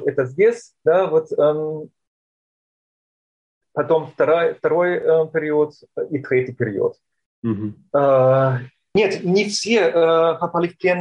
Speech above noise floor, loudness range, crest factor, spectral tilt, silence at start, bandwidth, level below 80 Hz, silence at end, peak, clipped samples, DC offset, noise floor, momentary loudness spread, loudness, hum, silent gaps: over 72 dB; 5 LU; 14 dB; -6 dB/octave; 0 s; 10.5 kHz; -64 dBFS; 0 s; -6 dBFS; under 0.1%; under 0.1%; under -90 dBFS; 11 LU; -19 LUFS; none; 2.07-3.61 s, 7.26-7.42 s